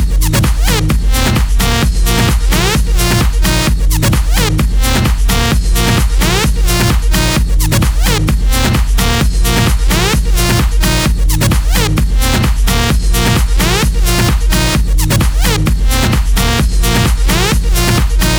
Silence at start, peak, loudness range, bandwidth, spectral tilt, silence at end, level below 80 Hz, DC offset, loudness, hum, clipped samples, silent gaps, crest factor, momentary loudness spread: 0 s; -2 dBFS; 0 LU; over 20 kHz; -4 dB/octave; 0 s; -12 dBFS; under 0.1%; -12 LUFS; none; under 0.1%; none; 8 dB; 1 LU